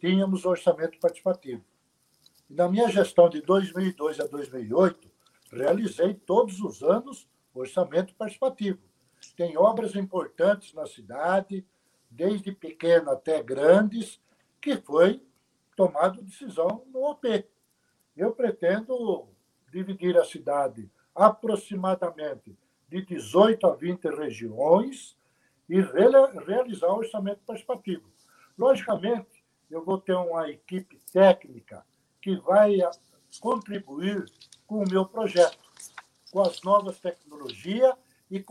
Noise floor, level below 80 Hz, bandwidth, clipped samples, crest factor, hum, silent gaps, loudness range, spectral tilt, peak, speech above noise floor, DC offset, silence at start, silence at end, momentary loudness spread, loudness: -71 dBFS; -74 dBFS; 12.5 kHz; under 0.1%; 22 dB; none; none; 4 LU; -6.5 dB/octave; -4 dBFS; 46 dB; under 0.1%; 0.05 s; 0.1 s; 17 LU; -25 LUFS